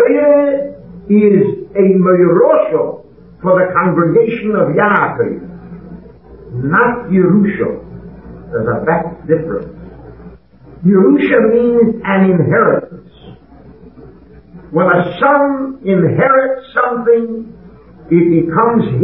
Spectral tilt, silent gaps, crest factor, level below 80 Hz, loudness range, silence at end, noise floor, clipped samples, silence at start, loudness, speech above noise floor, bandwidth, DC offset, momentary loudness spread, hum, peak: -12.5 dB/octave; none; 12 dB; -44 dBFS; 4 LU; 0 s; -39 dBFS; under 0.1%; 0 s; -12 LUFS; 27 dB; 4.1 kHz; 0.3%; 17 LU; none; 0 dBFS